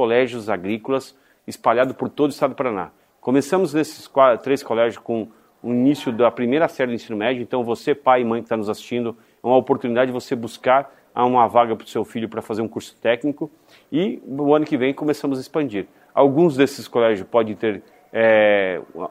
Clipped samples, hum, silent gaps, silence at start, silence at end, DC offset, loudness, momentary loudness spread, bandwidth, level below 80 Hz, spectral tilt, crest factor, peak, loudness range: under 0.1%; none; none; 0 s; 0 s; under 0.1%; -20 LUFS; 11 LU; 16 kHz; -66 dBFS; -6 dB/octave; 18 dB; -2 dBFS; 3 LU